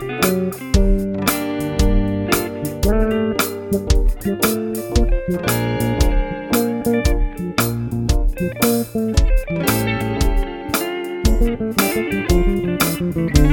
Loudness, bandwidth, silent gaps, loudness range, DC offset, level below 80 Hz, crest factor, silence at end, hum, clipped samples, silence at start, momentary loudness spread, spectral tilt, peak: -19 LUFS; 17.5 kHz; none; 1 LU; under 0.1%; -20 dBFS; 18 dB; 0 s; none; under 0.1%; 0 s; 4 LU; -5.5 dB/octave; 0 dBFS